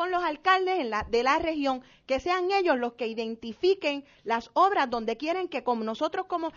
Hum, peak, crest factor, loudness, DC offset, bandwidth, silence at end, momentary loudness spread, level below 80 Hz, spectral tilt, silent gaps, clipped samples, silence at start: none; -10 dBFS; 18 dB; -27 LUFS; under 0.1%; 7.2 kHz; 0.05 s; 8 LU; -56 dBFS; -1.5 dB/octave; none; under 0.1%; 0 s